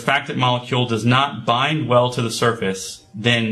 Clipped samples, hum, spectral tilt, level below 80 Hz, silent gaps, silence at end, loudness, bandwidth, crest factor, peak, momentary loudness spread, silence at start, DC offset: under 0.1%; none; -5 dB/octave; -54 dBFS; none; 0 s; -19 LUFS; 13 kHz; 18 dB; 0 dBFS; 7 LU; 0 s; under 0.1%